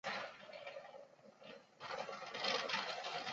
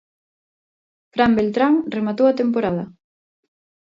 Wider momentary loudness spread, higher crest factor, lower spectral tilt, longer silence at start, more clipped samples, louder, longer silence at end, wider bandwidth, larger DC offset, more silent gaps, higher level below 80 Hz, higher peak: first, 19 LU vs 11 LU; about the same, 22 dB vs 18 dB; second, 0.5 dB/octave vs -8 dB/octave; second, 0.05 s vs 1.15 s; neither; second, -43 LUFS vs -19 LUFS; second, 0 s vs 0.95 s; about the same, 7.6 kHz vs 7.4 kHz; neither; neither; second, -88 dBFS vs -56 dBFS; second, -24 dBFS vs -2 dBFS